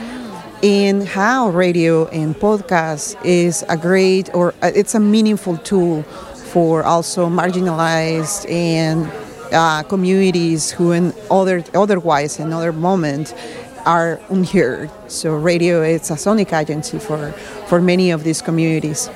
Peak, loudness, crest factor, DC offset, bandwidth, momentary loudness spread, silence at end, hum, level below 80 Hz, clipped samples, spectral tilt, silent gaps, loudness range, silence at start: 0 dBFS; -16 LUFS; 16 dB; under 0.1%; 14.5 kHz; 9 LU; 0 s; none; -50 dBFS; under 0.1%; -5.5 dB/octave; none; 2 LU; 0 s